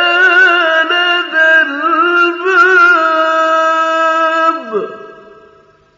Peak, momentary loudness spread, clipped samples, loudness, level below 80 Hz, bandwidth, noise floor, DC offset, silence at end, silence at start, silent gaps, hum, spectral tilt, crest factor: 0 dBFS; 7 LU; under 0.1%; -9 LUFS; -68 dBFS; 7.6 kHz; -46 dBFS; under 0.1%; 0.85 s; 0 s; none; none; -2 dB/octave; 10 dB